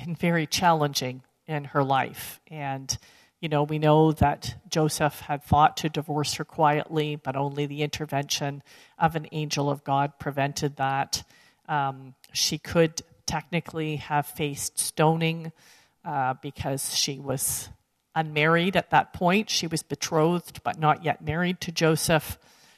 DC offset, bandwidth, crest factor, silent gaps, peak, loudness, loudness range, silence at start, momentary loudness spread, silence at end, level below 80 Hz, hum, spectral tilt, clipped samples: under 0.1%; 14 kHz; 20 dB; none; -6 dBFS; -26 LUFS; 4 LU; 0 s; 11 LU; 0.4 s; -52 dBFS; none; -4.5 dB/octave; under 0.1%